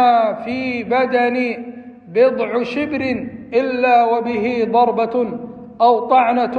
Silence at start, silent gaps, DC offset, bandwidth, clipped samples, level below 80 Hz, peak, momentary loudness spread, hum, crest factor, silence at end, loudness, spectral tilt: 0 s; none; under 0.1%; 6.6 kHz; under 0.1%; -58 dBFS; -2 dBFS; 10 LU; none; 14 dB; 0 s; -17 LUFS; -7 dB/octave